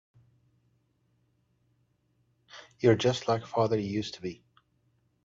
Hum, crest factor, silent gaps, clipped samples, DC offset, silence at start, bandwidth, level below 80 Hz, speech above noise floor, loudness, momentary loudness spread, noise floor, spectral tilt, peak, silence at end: none; 22 dB; none; under 0.1%; under 0.1%; 2.55 s; 7.8 kHz; -68 dBFS; 44 dB; -28 LUFS; 17 LU; -72 dBFS; -6 dB/octave; -10 dBFS; 0.9 s